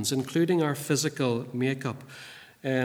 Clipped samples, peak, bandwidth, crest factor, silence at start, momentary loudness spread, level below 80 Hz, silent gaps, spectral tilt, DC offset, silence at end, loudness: under 0.1%; -12 dBFS; over 20 kHz; 16 dB; 0 s; 18 LU; -74 dBFS; none; -5 dB/octave; under 0.1%; 0 s; -28 LUFS